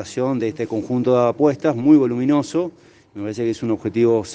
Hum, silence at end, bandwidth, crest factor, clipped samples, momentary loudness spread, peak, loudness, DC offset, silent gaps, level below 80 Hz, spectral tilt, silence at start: none; 0 s; 9.2 kHz; 16 dB; under 0.1%; 10 LU; -2 dBFS; -19 LUFS; under 0.1%; none; -62 dBFS; -7 dB/octave; 0 s